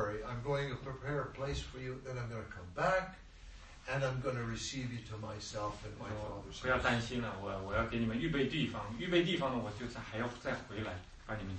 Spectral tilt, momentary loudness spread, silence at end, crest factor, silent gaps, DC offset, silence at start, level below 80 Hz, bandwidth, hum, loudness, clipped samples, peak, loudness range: -5.5 dB/octave; 12 LU; 0 s; 20 dB; none; under 0.1%; 0 s; -54 dBFS; 8.4 kHz; none; -38 LUFS; under 0.1%; -18 dBFS; 5 LU